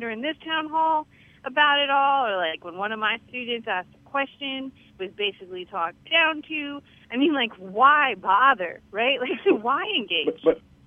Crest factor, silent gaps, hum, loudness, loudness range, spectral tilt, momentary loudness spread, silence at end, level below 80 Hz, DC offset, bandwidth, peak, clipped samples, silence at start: 20 dB; none; none; -23 LUFS; 7 LU; -5.5 dB/octave; 12 LU; 0.3 s; -66 dBFS; under 0.1%; 5.4 kHz; -4 dBFS; under 0.1%; 0 s